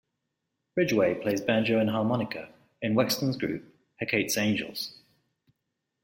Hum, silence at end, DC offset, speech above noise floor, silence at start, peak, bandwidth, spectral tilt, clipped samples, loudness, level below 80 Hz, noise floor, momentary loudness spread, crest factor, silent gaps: none; 1.1 s; under 0.1%; 55 dB; 0.75 s; -10 dBFS; 16.5 kHz; -4.5 dB/octave; under 0.1%; -28 LUFS; -66 dBFS; -82 dBFS; 11 LU; 20 dB; none